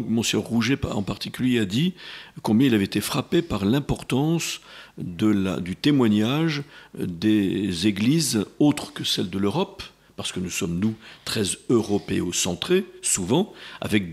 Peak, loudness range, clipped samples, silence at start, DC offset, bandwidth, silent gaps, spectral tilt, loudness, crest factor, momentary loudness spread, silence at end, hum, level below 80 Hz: -6 dBFS; 3 LU; under 0.1%; 0 s; under 0.1%; 16 kHz; none; -4.5 dB/octave; -23 LUFS; 18 dB; 11 LU; 0 s; none; -52 dBFS